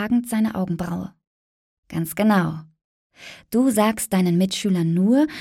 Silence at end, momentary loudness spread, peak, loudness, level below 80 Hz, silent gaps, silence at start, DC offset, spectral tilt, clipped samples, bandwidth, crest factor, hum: 0 s; 14 LU; -4 dBFS; -21 LUFS; -56 dBFS; 1.27-1.83 s, 2.84-3.10 s; 0 s; under 0.1%; -6 dB/octave; under 0.1%; 16.5 kHz; 16 dB; none